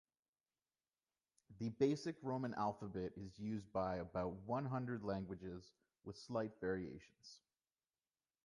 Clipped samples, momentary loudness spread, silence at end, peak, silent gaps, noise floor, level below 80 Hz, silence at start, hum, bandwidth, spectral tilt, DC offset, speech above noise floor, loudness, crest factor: under 0.1%; 17 LU; 1.05 s; -24 dBFS; none; under -90 dBFS; -70 dBFS; 1.5 s; none; 11 kHz; -7 dB/octave; under 0.1%; over 46 dB; -44 LUFS; 22 dB